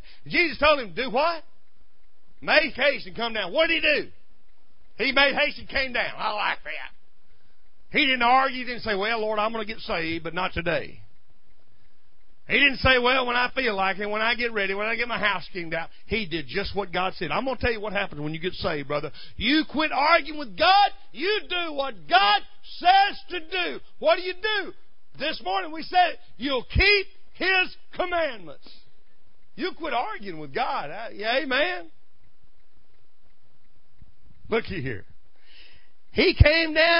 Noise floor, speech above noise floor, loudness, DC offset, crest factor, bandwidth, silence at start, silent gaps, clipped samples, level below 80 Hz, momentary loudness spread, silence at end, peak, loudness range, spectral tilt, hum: -61 dBFS; 37 dB; -24 LUFS; 2%; 24 dB; 5.6 kHz; 0.05 s; none; under 0.1%; -40 dBFS; 13 LU; 0 s; -2 dBFS; 8 LU; -8.5 dB/octave; none